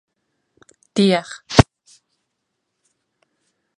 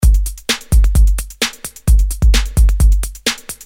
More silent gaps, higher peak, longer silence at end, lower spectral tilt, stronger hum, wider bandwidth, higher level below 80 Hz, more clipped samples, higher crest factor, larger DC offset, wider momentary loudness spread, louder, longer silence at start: neither; about the same, 0 dBFS vs -2 dBFS; first, 2.15 s vs 0.1 s; first, -5.5 dB/octave vs -4 dB/octave; neither; second, 11.5 kHz vs 16.5 kHz; second, -38 dBFS vs -12 dBFS; neither; first, 22 dB vs 10 dB; neither; about the same, 7 LU vs 6 LU; about the same, -18 LUFS vs -16 LUFS; first, 0.95 s vs 0 s